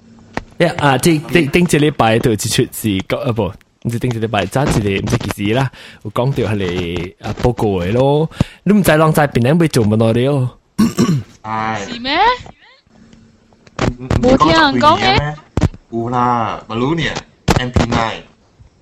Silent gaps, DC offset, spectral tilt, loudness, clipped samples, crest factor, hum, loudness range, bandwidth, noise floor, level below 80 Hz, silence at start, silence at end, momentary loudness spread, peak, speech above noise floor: none; under 0.1%; -5.5 dB/octave; -15 LUFS; under 0.1%; 16 dB; none; 4 LU; 16 kHz; -47 dBFS; -34 dBFS; 0.35 s; 0.6 s; 11 LU; 0 dBFS; 33 dB